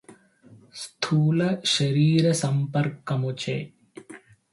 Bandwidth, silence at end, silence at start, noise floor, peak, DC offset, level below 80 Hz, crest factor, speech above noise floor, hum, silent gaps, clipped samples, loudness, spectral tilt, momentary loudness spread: 11.5 kHz; 0.35 s; 0.1 s; -53 dBFS; -8 dBFS; under 0.1%; -64 dBFS; 16 dB; 30 dB; none; none; under 0.1%; -24 LUFS; -5.5 dB/octave; 20 LU